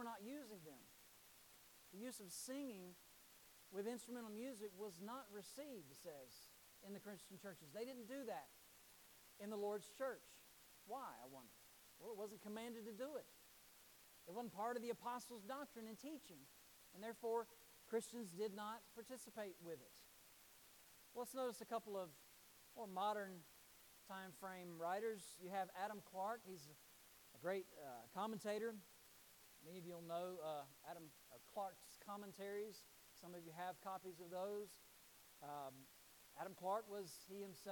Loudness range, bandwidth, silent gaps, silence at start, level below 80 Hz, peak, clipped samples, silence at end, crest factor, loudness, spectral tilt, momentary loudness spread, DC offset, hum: 5 LU; 19 kHz; none; 0 s; -88 dBFS; -32 dBFS; under 0.1%; 0 s; 20 dB; -52 LUFS; -4 dB/octave; 17 LU; under 0.1%; none